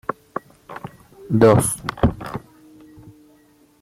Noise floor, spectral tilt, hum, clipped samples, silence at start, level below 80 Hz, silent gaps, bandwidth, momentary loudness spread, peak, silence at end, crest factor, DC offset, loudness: -55 dBFS; -6 dB/octave; none; under 0.1%; 0.7 s; -40 dBFS; none; 16 kHz; 23 LU; -2 dBFS; 0.7 s; 20 dB; under 0.1%; -18 LUFS